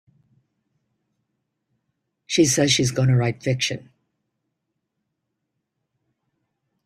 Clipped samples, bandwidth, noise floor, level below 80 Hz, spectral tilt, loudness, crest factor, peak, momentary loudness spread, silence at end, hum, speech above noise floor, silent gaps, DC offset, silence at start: under 0.1%; 14 kHz; -79 dBFS; -58 dBFS; -4.5 dB/octave; -20 LUFS; 20 dB; -6 dBFS; 8 LU; 3.05 s; none; 59 dB; none; under 0.1%; 2.3 s